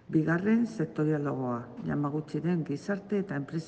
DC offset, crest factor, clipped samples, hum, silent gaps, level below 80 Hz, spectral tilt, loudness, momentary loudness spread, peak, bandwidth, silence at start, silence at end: under 0.1%; 16 dB; under 0.1%; none; none; -68 dBFS; -8.5 dB/octave; -31 LUFS; 7 LU; -14 dBFS; 8.8 kHz; 0.1 s; 0 s